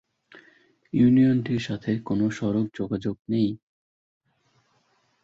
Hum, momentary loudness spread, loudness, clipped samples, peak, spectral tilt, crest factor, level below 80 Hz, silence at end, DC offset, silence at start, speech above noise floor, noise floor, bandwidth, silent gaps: none; 10 LU; -24 LUFS; under 0.1%; -10 dBFS; -8 dB/octave; 16 dB; -58 dBFS; 1.7 s; under 0.1%; 0.95 s; 44 dB; -68 dBFS; 7.6 kHz; 3.19-3.25 s